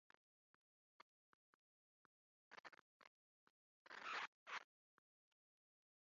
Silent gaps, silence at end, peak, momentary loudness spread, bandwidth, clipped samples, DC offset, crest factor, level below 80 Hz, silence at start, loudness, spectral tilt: 2.60-2.64 s, 2.81-3.00 s, 3.07-3.85 s, 4.27-4.46 s; 1.4 s; -38 dBFS; 16 LU; 7.2 kHz; under 0.1%; under 0.1%; 22 dB; under -90 dBFS; 2.5 s; -53 LUFS; 2.5 dB/octave